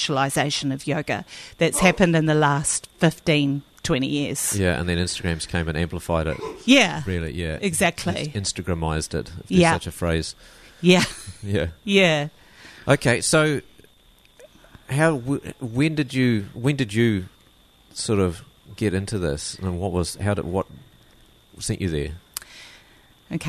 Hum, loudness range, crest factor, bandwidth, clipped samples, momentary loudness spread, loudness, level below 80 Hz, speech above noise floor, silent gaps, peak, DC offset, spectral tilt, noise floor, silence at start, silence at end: none; 6 LU; 20 dB; 13.5 kHz; under 0.1%; 12 LU; -22 LUFS; -42 dBFS; 33 dB; none; -2 dBFS; under 0.1%; -4.5 dB/octave; -55 dBFS; 0 s; 0 s